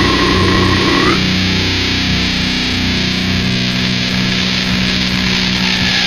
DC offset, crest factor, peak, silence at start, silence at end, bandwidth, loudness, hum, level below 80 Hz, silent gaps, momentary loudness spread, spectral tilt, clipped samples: under 0.1%; 14 dB; 0 dBFS; 0 s; 0 s; 15 kHz; -13 LUFS; none; -28 dBFS; none; 3 LU; -4 dB/octave; under 0.1%